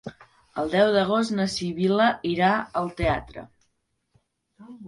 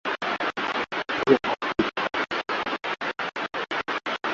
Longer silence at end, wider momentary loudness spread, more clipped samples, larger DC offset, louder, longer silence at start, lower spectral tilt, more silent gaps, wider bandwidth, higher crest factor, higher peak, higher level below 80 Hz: about the same, 0 s vs 0 s; first, 15 LU vs 8 LU; neither; neither; first, -23 LUFS vs -26 LUFS; about the same, 0.05 s vs 0.05 s; first, -5.5 dB/octave vs -1.5 dB/octave; neither; first, 11.5 kHz vs 7.6 kHz; about the same, 18 dB vs 22 dB; about the same, -6 dBFS vs -4 dBFS; first, -48 dBFS vs -60 dBFS